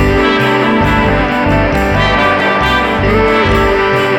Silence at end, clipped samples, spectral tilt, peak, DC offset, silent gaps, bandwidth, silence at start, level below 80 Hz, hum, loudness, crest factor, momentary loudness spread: 0 s; under 0.1%; -6 dB/octave; 0 dBFS; under 0.1%; none; 19.5 kHz; 0 s; -22 dBFS; none; -11 LUFS; 10 dB; 2 LU